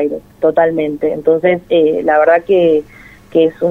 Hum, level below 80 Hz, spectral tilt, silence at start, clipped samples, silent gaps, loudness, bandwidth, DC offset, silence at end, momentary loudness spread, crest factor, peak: none; -48 dBFS; -7.5 dB/octave; 0 s; under 0.1%; none; -13 LUFS; 4.1 kHz; under 0.1%; 0 s; 6 LU; 12 dB; 0 dBFS